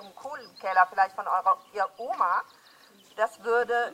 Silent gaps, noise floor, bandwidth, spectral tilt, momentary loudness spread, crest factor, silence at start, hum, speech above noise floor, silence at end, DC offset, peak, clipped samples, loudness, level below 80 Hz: none; -56 dBFS; 16 kHz; -2.5 dB/octave; 16 LU; 20 dB; 0 s; none; 30 dB; 0 s; under 0.1%; -8 dBFS; under 0.1%; -27 LUFS; -78 dBFS